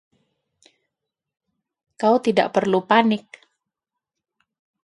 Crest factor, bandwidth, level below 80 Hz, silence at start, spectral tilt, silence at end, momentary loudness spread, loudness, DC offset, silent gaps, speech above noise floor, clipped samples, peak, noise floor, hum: 22 dB; 11.5 kHz; -72 dBFS; 2 s; -6 dB/octave; 1.65 s; 6 LU; -19 LUFS; under 0.1%; none; 66 dB; under 0.1%; -2 dBFS; -85 dBFS; none